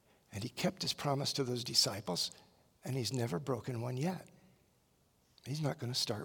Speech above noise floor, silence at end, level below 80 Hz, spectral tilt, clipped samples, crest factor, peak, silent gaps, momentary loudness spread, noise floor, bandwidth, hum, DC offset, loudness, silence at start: 36 dB; 0 s; -74 dBFS; -4 dB/octave; under 0.1%; 22 dB; -16 dBFS; none; 13 LU; -72 dBFS; 18 kHz; none; under 0.1%; -36 LUFS; 0.3 s